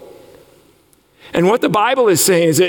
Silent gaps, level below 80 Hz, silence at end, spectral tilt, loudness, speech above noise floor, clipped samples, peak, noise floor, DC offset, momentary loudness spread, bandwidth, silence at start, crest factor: none; -58 dBFS; 0 s; -4 dB/octave; -14 LUFS; 41 dB; under 0.1%; -4 dBFS; -53 dBFS; under 0.1%; 5 LU; 18 kHz; 0 s; 12 dB